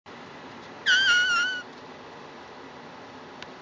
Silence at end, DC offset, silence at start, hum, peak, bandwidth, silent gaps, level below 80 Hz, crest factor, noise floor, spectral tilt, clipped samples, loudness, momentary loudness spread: 0 s; under 0.1%; 0.05 s; none; -10 dBFS; 7.6 kHz; none; -68 dBFS; 20 dB; -44 dBFS; 0 dB/octave; under 0.1%; -22 LUFS; 24 LU